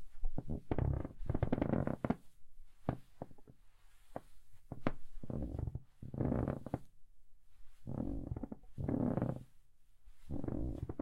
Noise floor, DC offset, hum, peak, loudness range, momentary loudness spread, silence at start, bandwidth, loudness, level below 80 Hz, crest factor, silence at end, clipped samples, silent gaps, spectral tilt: -58 dBFS; under 0.1%; none; -14 dBFS; 7 LU; 16 LU; 0 s; 4.7 kHz; -41 LUFS; -48 dBFS; 26 dB; 0 s; under 0.1%; none; -10 dB/octave